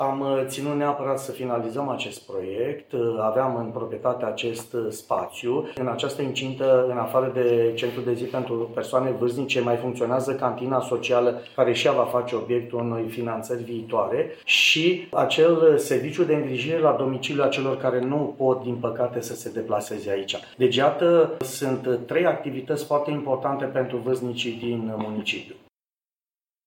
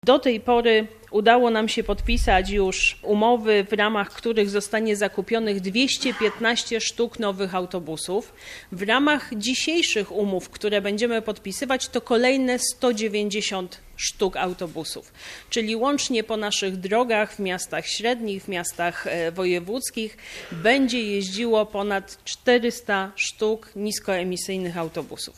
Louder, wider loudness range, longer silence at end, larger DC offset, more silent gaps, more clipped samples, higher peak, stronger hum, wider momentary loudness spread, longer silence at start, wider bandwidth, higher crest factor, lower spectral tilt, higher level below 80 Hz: about the same, -24 LUFS vs -23 LUFS; about the same, 6 LU vs 5 LU; first, 1.1 s vs 0.05 s; neither; neither; neither; second, -6 dBFS vs -2 dBFS; neither; about the same, 9 LU vs 10 LU; about the same, 0 s vs 0.05 s; first, 16.5 kHz vs 14.5 kHz; about the same, 18 dB vs 20 dB; first, -5 dB/octave vs -3.5 dB/octave; second, -70 dBFS vs -40 dBFS